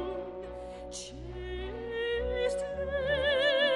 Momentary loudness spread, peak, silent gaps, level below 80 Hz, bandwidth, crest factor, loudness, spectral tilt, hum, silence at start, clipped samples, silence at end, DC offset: 15 LU; -16 dBFS; none; -46 dBFS; 11.5 kHz; 16 dB; -33 LUFS; -3.5 dB/octave; none; 0 s; under 0.1%; 0 s; under 0.1%